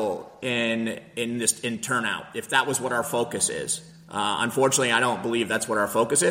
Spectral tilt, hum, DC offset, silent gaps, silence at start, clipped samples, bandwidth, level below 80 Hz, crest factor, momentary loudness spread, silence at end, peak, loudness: -2.5 dB/octave; none; under 0.1%; none; 0 s; under 0.1%; 16.5 kHz; -64 dBFS; 20 dB; 9 LU; 0 s; -6 dBFS; -25 LUFS